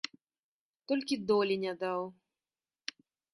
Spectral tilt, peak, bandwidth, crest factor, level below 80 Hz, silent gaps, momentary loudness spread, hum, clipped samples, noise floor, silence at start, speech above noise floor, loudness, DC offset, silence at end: -5 dB/octave; -16 dBFS; 11.5 kHz; 20 dB; -78 dBFS; none; 15 LU; none; under 0.1%; under -90 dBFS; 0.9 s; over 58 dB; -33 LUFS; under 0.1%; 1.2 s